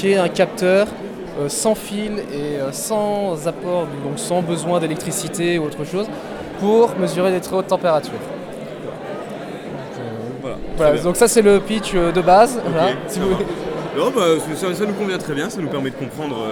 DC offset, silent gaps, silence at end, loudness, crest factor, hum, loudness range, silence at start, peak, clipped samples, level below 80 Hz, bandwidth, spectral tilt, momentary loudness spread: under 0.1%; none; 0 s; -19 LUFS; 18 dB; none; 6 LU; 0 s; 0 dBFS; under 0.1%; -42 dBFS; 19.5 kHz; -5 dB/octave; 15 LU